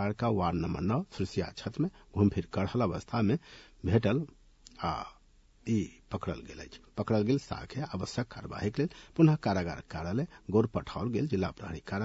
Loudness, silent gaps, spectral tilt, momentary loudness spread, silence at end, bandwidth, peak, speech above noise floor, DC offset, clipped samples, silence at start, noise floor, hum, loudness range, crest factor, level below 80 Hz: -32 LUFS; none; -7.5 dB/octave; 11 LU; 0 s; 8 kHz; -12 dBFS; 30 dB; under 0.1%; under 0.1%; 0 s; -61 dBFS; none; 4 LU; 20 dB; -56 dBFS